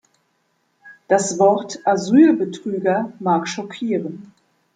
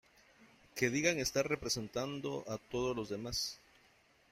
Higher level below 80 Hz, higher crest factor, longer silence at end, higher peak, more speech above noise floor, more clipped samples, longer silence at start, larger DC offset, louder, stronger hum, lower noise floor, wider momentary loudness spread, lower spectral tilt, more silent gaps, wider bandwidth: second, -68 dBFS vs -62 dBFS; second, 18 dB vs 24 dB; second, 0.55 s vs 0.75 s; first, -2 dBFS vs -14 dBFS; first, 49 dB vs 31 dB; neither; first, 0.85 s vs 0.4 s; neither; first, -19 LUFS vs -37 LUFS; neither; about the same, -67 dBFS vs -68 dBFS; first, 13 LU vs 9 LU; first, -5.5 dB/octave vs -3.5 dB/octave; neither; second, 9.4 kHz vs 16 kHz